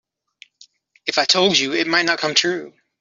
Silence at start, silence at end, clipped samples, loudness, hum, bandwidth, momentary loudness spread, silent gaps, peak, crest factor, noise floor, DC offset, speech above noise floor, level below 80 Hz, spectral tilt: 1.05 s; 0.3 s; under 0.1%; -17 LUFS; none; 7.8 kHz; 10 LU; none; -2 dBFS; 18 dB; -53 dBFS; under 0.1%; 34 dB; -66 dBFS; -2 dB/octave